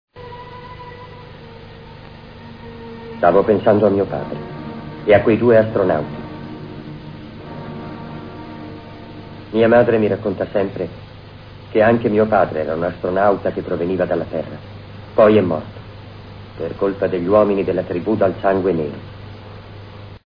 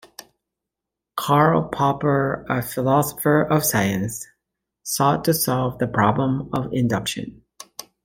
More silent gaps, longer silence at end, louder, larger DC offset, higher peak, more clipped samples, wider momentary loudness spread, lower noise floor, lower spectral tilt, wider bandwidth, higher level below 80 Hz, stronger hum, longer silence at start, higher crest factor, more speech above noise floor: neither; about the same, 0.1 s vs 0.2 s; first, -17 LUFS vs -21 LUFS; neither; first, 0 dBFS vs -4 dBFS; neither; first, 23 LU vs 15 LU; second, -38 dBFS vs -85 dBFS; first, -10 dB/octave vs -5 dB/octave; second, 5.2 kHz vs 17 kHz; first, -46 dBFS vs -52 dBFS; neither; second, 0.15 s vs 1.15 s; about the same, 18 dB vs 18 dB; second, 22 dB vs 65 dB